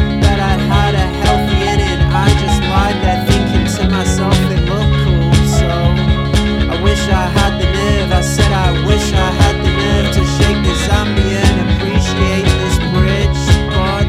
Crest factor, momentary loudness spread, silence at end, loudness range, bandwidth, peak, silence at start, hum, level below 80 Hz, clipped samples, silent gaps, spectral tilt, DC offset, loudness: 12 dB; 2 LU; 0 s; 0 LU; 14.5 kHz; 0 dBFS; 0 s; none; -18 dBFS; under 0.1%; none; -5.5 dB/octave; under 0.1%; -13 LUFS